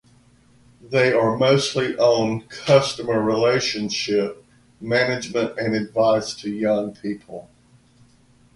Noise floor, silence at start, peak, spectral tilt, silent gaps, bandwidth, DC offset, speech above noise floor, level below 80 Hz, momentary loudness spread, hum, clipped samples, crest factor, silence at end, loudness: -55 dBFS; 0.85 s; -2 dBFS; -5 dB/octave; none; 11.5 kHz; under 0.1%; 35 dB; -58 dBFS; 12 LU; none; under 0.1%; 20 dB; 1.15 s; -21 LUFS